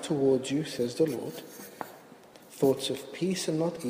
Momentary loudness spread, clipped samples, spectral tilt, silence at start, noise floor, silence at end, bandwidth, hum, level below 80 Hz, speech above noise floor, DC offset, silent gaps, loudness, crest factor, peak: 17 LU; under 0.1%; -5 dB/octave; 0 s; -52 dBFS; 0 s; 15.5 kHz; none; -68 dBFS; 23 dB; under 0.1%; none; -29 LUFS; 18 dB; -12 dBFS